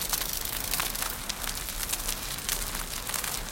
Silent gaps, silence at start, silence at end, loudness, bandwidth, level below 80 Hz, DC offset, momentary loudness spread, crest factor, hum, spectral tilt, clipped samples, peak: none; 0 s; 0 s; -30 LUFS; 17 kHz; -42 dBFS; under 0.1%; 4 LU; 26 dB; none; -1 dB/octave; under 0.1%; -6 dBFS